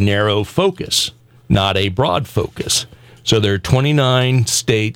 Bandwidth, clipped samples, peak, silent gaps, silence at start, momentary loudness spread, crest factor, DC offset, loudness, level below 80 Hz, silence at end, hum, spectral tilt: 17 kHz; under 0.1%; -2 dBFS; none; 0 s; 7 LU; 14 dB; under 0.1%; -16 LUFS; -40 dBFS; 0.05 s; none; -4.5 dB/octave